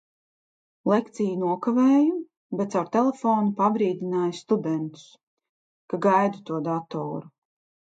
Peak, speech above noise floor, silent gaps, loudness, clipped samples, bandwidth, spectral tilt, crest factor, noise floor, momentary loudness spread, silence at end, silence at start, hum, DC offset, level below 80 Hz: -8 dBFS; over 66 dB; 2.37-2.50 s, 5.23-5.37 s, 5.49-5.89 s; -24 LUFS; under 0.1%; 9 kHz; -7.5 dB/octave; 18 dB; under -90 dBFS; 11 LU; 0.6 s; 0.85 s; none; under 0.1%; -76 dBFS